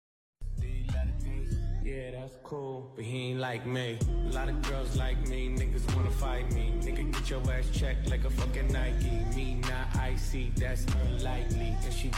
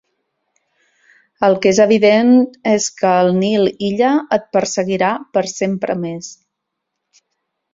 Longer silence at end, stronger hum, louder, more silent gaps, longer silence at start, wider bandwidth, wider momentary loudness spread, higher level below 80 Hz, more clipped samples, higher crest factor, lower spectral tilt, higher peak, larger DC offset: second, 0 s vs 1.4 s; neither; second, -33 LUFS vs -15 LUFS; neither; second, 0.4 s vs 1.4 s; first, 14 kHz vs 7.8 kHz; about the same, 7 LU vs 9 LU; first, -32 dBFS vs -58 dBFS; neither; second, 10 dB vs 16 dB; about the same, -6 dB/octave vs -5 dB/octave; second, -20 dBFS vs 0 dBFS; neither